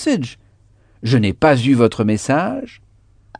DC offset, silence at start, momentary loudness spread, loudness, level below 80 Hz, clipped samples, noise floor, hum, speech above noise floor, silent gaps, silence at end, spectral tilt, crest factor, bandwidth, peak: under 0.1%; 0 s; 15 LU; -16 LUFS; -48 dBFS; under 0.1%; -52 dBFS; none; 36 dB; none; 0.7 s; -6.5 dB/octave; 18 dB; 10 kHz; 0 dBFS